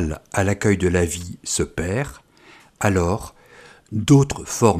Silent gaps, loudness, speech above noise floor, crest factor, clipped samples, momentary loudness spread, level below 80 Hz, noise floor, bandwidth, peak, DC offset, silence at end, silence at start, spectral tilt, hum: none; -21 LUFS; 30 dB; 20 dB; under 0.1%; 12 LU; -40 dBFS; -50 dBFS; 15.5 kHz; 0 dBFS; under 0.1%; 0 s; 0 s; -5.5 dB/octave; none